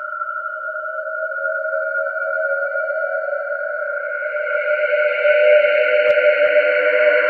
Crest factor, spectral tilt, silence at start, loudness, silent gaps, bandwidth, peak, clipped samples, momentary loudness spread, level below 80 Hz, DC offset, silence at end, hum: 16 dB; -3 dB/octave; 0 s; -18 LUFS; none; 4.7 kHz; -2 dBFS; under 0.1%; 11 LU; -76 dBFS; under 0.1%; 0 s; none